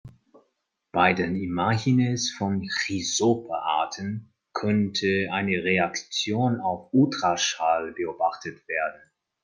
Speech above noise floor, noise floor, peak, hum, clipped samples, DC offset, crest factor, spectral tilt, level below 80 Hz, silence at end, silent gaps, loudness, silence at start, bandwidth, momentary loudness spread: 49 dB; -74 dBFS; -6 dBFS; none; under 0.1%; under 0.1%; 20 dB; -4.5 dB/octave; -64 dBFS; 0.45 s; none; -25 LUFS; 0.05 s; 10 kHz; 8 LU